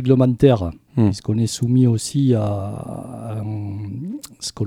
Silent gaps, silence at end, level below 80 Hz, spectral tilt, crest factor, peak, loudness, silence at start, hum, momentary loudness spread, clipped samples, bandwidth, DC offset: none; 0 s; -46 dBFS; -7 dB/octave; 18 dB; -2 dBFS; -20 LUFS; 0 s; none; 14 LU; under 0.1%; 15 kHz; under 0.1%